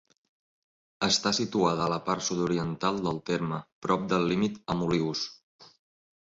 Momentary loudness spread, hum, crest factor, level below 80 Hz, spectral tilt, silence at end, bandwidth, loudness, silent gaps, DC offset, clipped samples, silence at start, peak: 6 LU; none; 20 dB; -60 dBFS; -4.5 dB/octave; 0.55 s; 8 kHz; -28 LUFS; 3.72-3.82 s, 5.43-5.59 s; under 0.1%; under 0.1%; 1 s; -10 dBFS